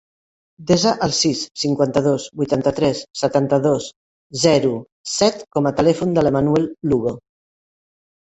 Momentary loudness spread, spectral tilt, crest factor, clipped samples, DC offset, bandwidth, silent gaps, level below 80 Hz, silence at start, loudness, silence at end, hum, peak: 8 LU; -5 dB/octave; 18 dB; under 0.1%; under 0.1%; 8.2 kHz; 1.51-1.55 s, 3.96-4.30 s, 4.92-5.04 s; -50 dBFS; 0.6 s; -19 LUFS; 1.15 s; none; -2 dBFS